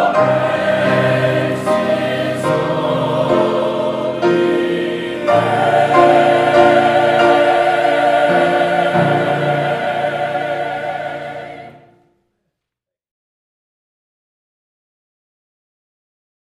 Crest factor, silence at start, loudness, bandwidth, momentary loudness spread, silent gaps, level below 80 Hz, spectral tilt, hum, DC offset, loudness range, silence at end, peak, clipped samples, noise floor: 16 dB; 0 s; -14 LUFS; 13 kHz; 10 LU; none; -58 dBFS; -6 dB/octave; none; under 0.1%; 12 LU; 4.8 s; 0 dBFS; under 0.1%; -84 dBFS